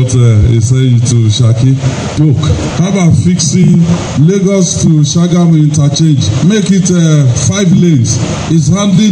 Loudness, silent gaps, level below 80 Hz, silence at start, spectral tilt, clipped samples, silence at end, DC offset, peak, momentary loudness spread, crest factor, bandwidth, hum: -8 LUFS; none; -30 dBFS; 0 s; -6 dB/octave; 1%; 0 s; under 0.1%; 0 dBFS; 4 LU; 8 dB; 10 kHz; none